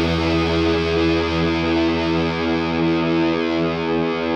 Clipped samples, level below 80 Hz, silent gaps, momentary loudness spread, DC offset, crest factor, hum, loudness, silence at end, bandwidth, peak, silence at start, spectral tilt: under 0.1%; -36 dBFS; none; 2 LU; under 0.1%; 12 dB; none; -19 LUFS; 0 s; 8 kHz; -6 dBFS; 0 s; -6.5 dB/octave